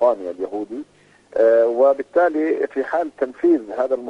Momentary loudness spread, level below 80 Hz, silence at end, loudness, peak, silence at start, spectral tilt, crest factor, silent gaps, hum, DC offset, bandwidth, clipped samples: 12 LU; -66 dBFS; 0 s; -19 LUFS; -4 dBFS; 0 s; -6.5 dB/octave; 14 dB; none; none; under 0.1%; 7.2 kHz; under 0.1%